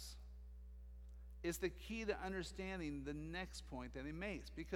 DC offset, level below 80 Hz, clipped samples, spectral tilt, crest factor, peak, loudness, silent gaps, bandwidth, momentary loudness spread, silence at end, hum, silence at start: under 0.1%; -56 dBFS; under 0.1%; -5 dB/octave; 20 dB; -28 dBFS; -47 LUFS; none; 17.5 kHz; 15 LU; 0 s; 60 Hz at -55 dBFS; 0 s